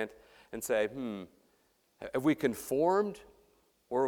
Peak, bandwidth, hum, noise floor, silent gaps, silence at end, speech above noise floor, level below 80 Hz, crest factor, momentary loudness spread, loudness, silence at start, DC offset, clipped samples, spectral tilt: -14 dBFS; 19.5 kHz; none; -72 dBFS; none; 0 s; 40 dB; -68 dBFS; 20 dB; 18 LU; -33 LUFS; 0 s; under 0.1%; under 0.1%; -5 dB/octave